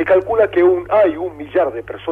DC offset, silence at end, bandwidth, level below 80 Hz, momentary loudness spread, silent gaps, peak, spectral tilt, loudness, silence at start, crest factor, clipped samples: under 0.1%; 0 s; 4 kHz; -48 dBFS; 9 LU; none; -4 dBFS; -8 dB/octave; -16 LUFS; 0 s; 12 dB; under 0.1%